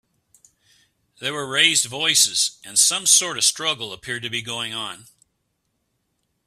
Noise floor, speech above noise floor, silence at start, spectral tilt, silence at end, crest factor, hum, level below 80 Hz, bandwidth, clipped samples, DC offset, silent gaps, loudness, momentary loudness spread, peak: -73 dBFS; 52 dB; 1.2 s; 0.5 dB/octave; 1.45 s; 24 dB; none; -66 dBFS; 16 kHz; under 0.1%; under 0.1%; none; -18 LUFS; 13 LU; 0 dBFS